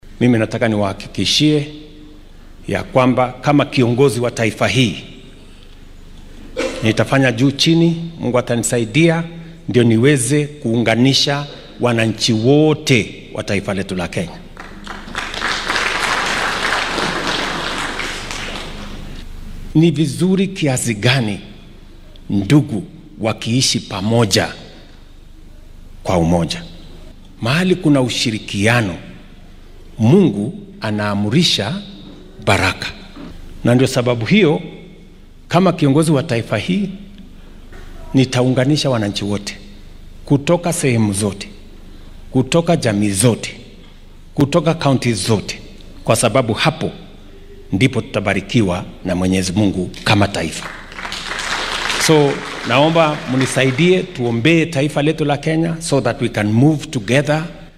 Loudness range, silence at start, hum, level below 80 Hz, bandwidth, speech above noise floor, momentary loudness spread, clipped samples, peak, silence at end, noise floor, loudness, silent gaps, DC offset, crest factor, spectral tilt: 4 LU; 0.05 s; none; -38 dBFS; 15.5 kHz; 24 dB; 14 LU; under 0.1%; 0 dBFS; 0.1 s; -39 dBFS; -16 LUFS; none; under 0.1%; 16 dB; -5 dB/octave